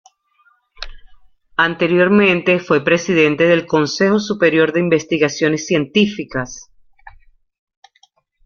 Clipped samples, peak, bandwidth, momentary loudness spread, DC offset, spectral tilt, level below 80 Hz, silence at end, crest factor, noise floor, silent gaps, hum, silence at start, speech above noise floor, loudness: under 0.1%; -2 dBFS; 7.2 kHz; 14 LU; under 0.1%; -5 dB/octave; -48 dBFS; 1.35 s; 16 dB; -58 dBFS; none; none; 0.8 s; 43 dB; -15 LUFS